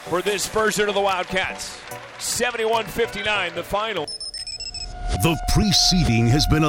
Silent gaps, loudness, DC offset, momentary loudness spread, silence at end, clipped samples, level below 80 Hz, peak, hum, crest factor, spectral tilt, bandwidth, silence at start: none; -21 LUFS; under 0.1%; 12 LU; 0 s; under 0.1%; -32 dBFS; -4 dBFS; none; 18 dB; -4 dB/octave; 18 kHz; 0 s